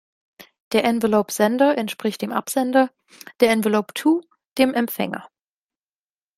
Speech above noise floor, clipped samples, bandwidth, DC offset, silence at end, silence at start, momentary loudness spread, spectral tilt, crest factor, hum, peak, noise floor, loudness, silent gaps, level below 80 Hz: over 70 dB; under 0.1%; 16 kHz; under 0.1%; 1.1 s; 0.4 s; 8 LU; -4.5 dB/octave; 18 dB; none; -2 dBFS; under -90 dBFS; -21 LUFS; 0.60-0.71 s; -64 dBFS